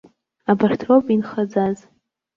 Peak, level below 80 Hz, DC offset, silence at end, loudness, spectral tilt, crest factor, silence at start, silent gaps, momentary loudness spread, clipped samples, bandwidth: -4 dBFS; -60 dBFS; under 0.1%; 0.6 s; -19 LUFS; -8 dB/octave; 16 dB; 0.5 s; none; 10 LU; under 0.1%; 7.4 kHz